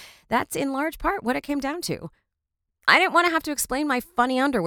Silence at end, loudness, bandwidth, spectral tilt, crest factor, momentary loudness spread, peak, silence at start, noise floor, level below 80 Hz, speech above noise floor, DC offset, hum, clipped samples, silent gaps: 0 s; -23 LUFS; over 20 kHz; -3 dB/octave; 22 dB; 11 LU; -2 dBFS; 0 s; -82 dBFS; -50 dBFS; 58 dB; under 0.1%; none; under 0.1%; none